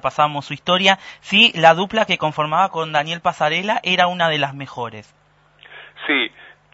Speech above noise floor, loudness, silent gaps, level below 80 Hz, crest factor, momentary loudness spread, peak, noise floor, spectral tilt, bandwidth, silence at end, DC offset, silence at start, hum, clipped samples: 32 dB; -17 LUFS; none; -62 dBFS; 20 dB; 13 LU; 0 dBFS; -50 dBFS; -4 dB/octave; 8 kHz; 0.45 s; under 0.1%; 0 s; none; under 0.1%